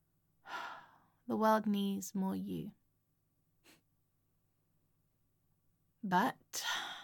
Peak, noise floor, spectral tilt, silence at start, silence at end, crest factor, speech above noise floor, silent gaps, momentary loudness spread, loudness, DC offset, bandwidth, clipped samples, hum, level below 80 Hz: -18 dBFS; -79 dBFS; -4.5 dB/octave; 0.45 s; 0 s; 22 dB; 44 dB; none; 17 LU; -36 LUFS; under 0.1%; 17.5 kHz; under 0.1%; none; -80 dBFS